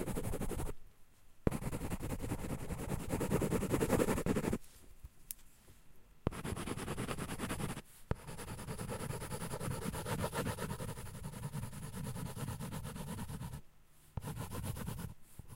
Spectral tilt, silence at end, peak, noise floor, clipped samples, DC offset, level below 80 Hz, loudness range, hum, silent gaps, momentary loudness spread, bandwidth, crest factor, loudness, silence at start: -5.5 dB/octave; 0 s; -12 dBFS; -62 dBFS; under 0.1%; under 0.1%; -50 dBFS; 8 LU; none; none; 13 LU; 16 kHz; 28 dB; -41 LUFS; 0 s